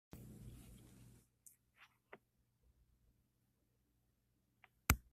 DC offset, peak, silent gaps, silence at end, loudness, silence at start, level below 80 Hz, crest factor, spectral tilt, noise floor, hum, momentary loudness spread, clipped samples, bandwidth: under 0.1%; -12 dBFS; none; 0.1 s; -44 LUFS; 0.15 s; -56 dBFS; 38 dB; -3.5 dB/octave; -81 dBFS; none; 28 LU; under 0.1%; 15.5 kHz